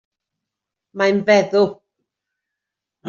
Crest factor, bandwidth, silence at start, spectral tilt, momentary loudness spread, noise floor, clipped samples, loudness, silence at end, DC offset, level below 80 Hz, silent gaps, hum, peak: 18 dB; 7.4 kHz; 0.95 s; -4 dB/octave; 7 LU; -84 dBFS; under 0.1%; -17 LUFS; 0 s; under 0.1%; -66 dBFS; none; none; -2 dBFS